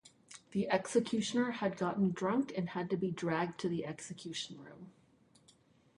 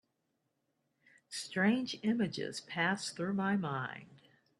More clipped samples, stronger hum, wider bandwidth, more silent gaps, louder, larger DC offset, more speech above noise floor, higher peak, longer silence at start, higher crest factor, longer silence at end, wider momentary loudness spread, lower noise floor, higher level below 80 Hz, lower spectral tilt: neither; neither; about the same, 11.5 kHz vs 12 kHz; neither; about the same, -36 LUFS vs -35 LUFS; neither; second, 32 dB vs 48 dB; about the same, -16 dBFS vs -18 dBFS; second, 0.05 s vs 1.3 s; about the same, 20 dB vs 20 dB; first, 1.05 s vs 0.45 s; first, 15 LU vs 12 LU; second, -67 dBFS vs -82 dBFS; about the same, -74 dBFS vs -78 dBFS; about the same, -5.5 dB/octave vs -5 dB/octave